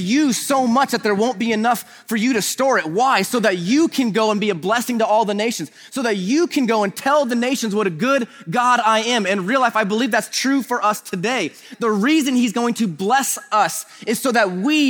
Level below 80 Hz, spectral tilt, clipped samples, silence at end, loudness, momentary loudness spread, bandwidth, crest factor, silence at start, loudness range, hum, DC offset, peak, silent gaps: -70 dBFS; -4 dB/octave; under 0.1%; 0 s; -18 LUFS; 5 LU; over 20 kHz; 16 dB; 0 s; 1 LU; none; under 0.1%; -2 dBFS; none